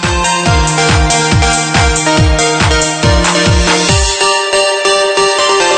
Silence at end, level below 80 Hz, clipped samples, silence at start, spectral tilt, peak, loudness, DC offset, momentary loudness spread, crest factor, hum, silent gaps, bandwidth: 0 s; -18 dBFS; under 0.1%; 0 s; -3.5 dB/octave; 0 dBFS; -9 LUFS; under 0.1%; 1 LU; 10 dB; none; none; 9.4 kHz